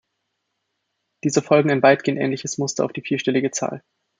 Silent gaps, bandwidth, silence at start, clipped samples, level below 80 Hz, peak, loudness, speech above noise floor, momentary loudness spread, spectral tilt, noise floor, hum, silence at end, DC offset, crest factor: none; 9.6 kHz; 1.25 s; under 0.1%; -66 dBFS; -2 dBFS; -20 LUFS; 56 dB; 11 LU; -5 dB/octave; -76 dBFS; none; 0.4 s; under 0.1%; 20 dB